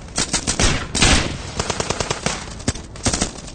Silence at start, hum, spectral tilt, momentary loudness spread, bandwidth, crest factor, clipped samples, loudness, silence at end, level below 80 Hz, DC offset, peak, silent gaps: 0 s; none; -2.5 dB/octave; 10 LU; 9.6 kHz; 20 dB; under 0.1%; -20 LUFS; 0 s; -28 dBFS; under 0.1%; -2 dBFS; none